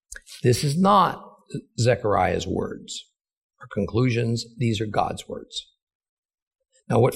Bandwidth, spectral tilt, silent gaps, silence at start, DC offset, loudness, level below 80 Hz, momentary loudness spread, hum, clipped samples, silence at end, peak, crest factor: 16 kHz; -6 dB/octave; 3.37-3.49 s, 5.82-5.87 s, 5.95-6.00 s, 6.09-6.29 s, 6.42-6.51 s; 0.1 s; under 0.1%; -23 LUFS; -54 dBFS; 17 LU; none; under 0.1%; 0 s; -6 dBFS; 20 dB